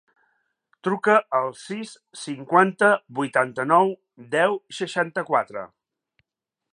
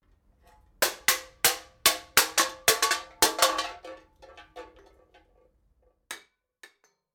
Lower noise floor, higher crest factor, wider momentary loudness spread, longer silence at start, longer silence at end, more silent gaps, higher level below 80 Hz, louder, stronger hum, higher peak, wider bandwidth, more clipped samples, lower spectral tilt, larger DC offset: first, -86 dBFS vs -67 dBFS; about the same, 22 dB vs 24 dB; second, 15 LU vs 21 LU; about the same, 0.85 s vs 0.8 s; about the same, 1.05 s vs 0.95 s; neither; second, -78 dBFS vs -60 dBFS; about the same, -22 LUFS vs -24 LUFS; neither; first, -2 dBFS vs -6 dBFS; second, 11.5 kHz vs 19.5 kHz; neither; first, -5 dB/octave vs 0.5 dB/octave; neither